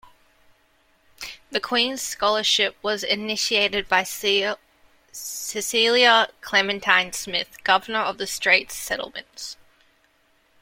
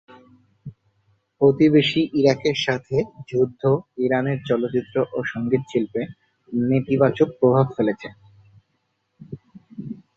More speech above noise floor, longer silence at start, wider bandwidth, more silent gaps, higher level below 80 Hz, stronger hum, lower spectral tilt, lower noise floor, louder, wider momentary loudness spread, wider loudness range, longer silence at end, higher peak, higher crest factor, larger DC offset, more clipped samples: second, 40 dB vs 51 dB; second, 0.05 s vs 0.65 s; first, 16.5 kHz vs 7.4 kHz; neither; about the same, -58 dBFS vs -60 dBFS; neither; second, -1 dB/octave vs -7 dB/octave; second, -63 dBFS vs -72 dBFS; about the same, -21 LUFS vs -21 LUFS; about the same, 16 LU vs 18 LU; about the same, 4 LU vs 3 LU; first, 1.1 s vs 0.25 s; about the same, -2 dBFS vs -4 dBFS; about the same, 22 dB vs 20 dB; neither; neither